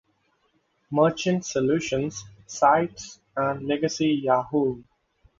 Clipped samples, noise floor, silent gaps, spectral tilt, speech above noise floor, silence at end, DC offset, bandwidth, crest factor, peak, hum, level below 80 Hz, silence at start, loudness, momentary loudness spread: under 0.1%; -69 dBFS; none; -5.5 dB/octave; 45 dB; 0.55 s; under 0.1%; 7.8 kHz; 20 dB; -6 dBFS; none; -58 dBFS; 0.9 s; -24 LUFS; 13 LU